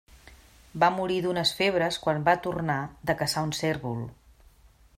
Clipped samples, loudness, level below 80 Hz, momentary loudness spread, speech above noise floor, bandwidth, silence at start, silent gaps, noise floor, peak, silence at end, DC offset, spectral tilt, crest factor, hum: under 0.1%; -27 LUFS; -56 dBFS; 9 LU; 30 dB; 16 kHz; 0.15 s; none; -57 dBFS; -8 dBFS; 0.85 s; under 0.1%; -4.5 dB/octave; 20 dB; none